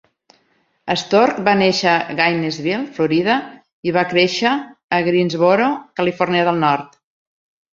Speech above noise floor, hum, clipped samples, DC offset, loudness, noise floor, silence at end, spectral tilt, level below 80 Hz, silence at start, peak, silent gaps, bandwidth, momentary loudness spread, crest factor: 46 dB; none; under 0.1%; under 0.1%; -17 LUFS; -62 dBFS; 0.85 s; -5 dB/octave; -60 dBFS; 0.85 s; -2 dBFS; 3.73-3.83 s, 4.84-4.89 s; 7.8 kHz; 8 LU; 16 dB